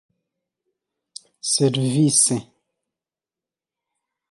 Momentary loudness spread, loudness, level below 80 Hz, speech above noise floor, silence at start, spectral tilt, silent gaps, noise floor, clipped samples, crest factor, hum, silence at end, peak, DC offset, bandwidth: 12 LU; -19 LUFS; -68 dBFS; 71 dB; 1.45 s; -4 dB/octave; none; -90 dBFS; under 0.1%; 22 dB; none; 1.9 s; -4 dBFS; under 0.1%; 12 kHz